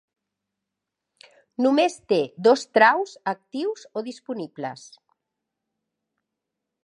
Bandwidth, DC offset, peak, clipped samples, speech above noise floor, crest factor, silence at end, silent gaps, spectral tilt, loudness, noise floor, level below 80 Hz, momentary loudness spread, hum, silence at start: 11 kHz; under 0.1%; -2 dBFS; under 0.1%; 62 dB; 22 dB; 2.1 s; none; -4.5 dB/octave; -23 LUFS; -84 dBFS; -80 dBFS; 16 LU; none; 1.6 s